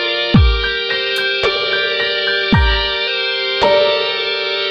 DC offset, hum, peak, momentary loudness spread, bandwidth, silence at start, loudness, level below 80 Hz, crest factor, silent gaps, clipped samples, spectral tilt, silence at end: under 0.1%; none; 0 dBFS; 4 LU; 13.5 kHz; 0 s; -14 LUFS; -24 dBFS; 14 dB; none; under 0.1%; -5.5 dB/octave; 0 s